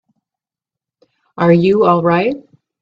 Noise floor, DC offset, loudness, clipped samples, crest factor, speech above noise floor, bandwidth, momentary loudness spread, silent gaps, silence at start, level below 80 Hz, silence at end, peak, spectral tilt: -87 dBFS; under 0.1%; -13 LUFS; under 0.1%; 16 dB; 75 dB; 5.6 kHz; 9 LU; none; 1.4 s; -56 dBFS; 0.4 s; 0 dBFS; -9.5 dB/octave